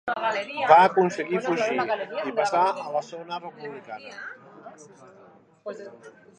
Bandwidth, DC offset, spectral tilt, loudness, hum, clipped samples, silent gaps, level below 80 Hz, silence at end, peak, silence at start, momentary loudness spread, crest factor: 10 kHz; under 0.1%; -5 dB/octave; -23 LUFS; none; under 0.1%; none; -76 dBFS; 0.3 s; -2 dBFS; 0.05 s; 22 LU; 24 dB